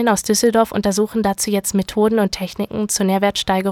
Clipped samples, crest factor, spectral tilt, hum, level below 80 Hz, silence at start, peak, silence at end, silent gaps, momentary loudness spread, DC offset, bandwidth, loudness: under 0.1%; 16 dB; -4 dB/octave; none; -46 dBFS; 0 s; -2 dBFS; 0 s; none; 5 LU; under 0.1%; 18.5 kHz; -18 LUFS